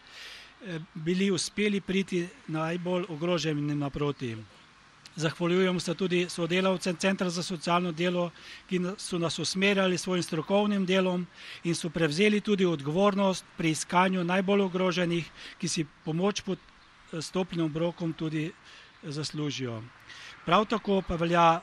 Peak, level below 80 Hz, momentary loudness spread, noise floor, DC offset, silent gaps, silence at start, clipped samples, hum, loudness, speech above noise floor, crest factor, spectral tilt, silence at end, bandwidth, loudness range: -8 dBFS; -58 dBFS; 13 LU; -56 dBFS; under 0.1%; none; 0.05 s; under 0.1%; none; -29 LUFS; 28 dB; 22 dB; -5 dB/octave; 0 s; 12.5 kHz; 6 LU